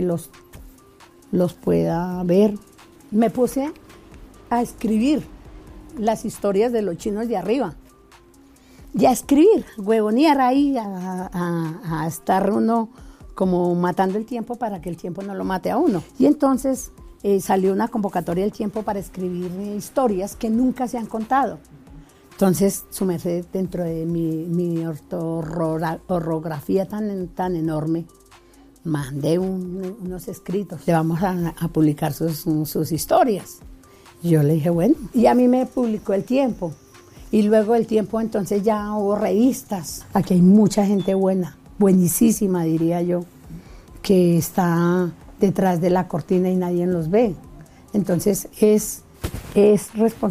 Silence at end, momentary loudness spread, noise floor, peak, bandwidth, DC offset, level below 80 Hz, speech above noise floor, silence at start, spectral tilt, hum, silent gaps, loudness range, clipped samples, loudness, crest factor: 0 s; 12 LU; -50 dBFS; -4 dBFS; 16 kHz; under 0.1%; -48 dBFS; 30 dB; 0 s; -7 dB/octave; none; none; 6 LU; under 0.1%; -21 LUFS; 18 dB